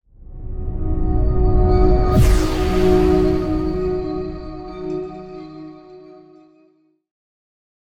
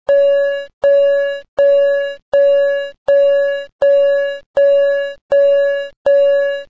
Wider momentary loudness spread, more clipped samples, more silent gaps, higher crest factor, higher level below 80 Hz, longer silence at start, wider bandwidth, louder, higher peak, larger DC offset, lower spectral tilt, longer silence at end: first, 19 LU vs 7 LU; neither; second, none vs 0.73-0.81 s, 1.48-1.57 s, 2.22-2.32 s, 2.98-3.06 s, 3.72-3.79 s, 4.46-4.54 s, 5.21-5.29 s, 5.96-6.05 s; first, 16 dB vs 8 dB; first, -22 dBFS vs -56 dBFS; about the same, 0.2 s vs 0.1 s; first, 15.5 kHz vs 7 kHz; second, -19 LUFS vs -14 LUFS; about the same, -4 dBFS vs -6 dBFS; second, under 0.1% vs 0.6%; first, -7.5 dB/octave vs -3 dB/octave; first, 1.9 s vs 0.05 s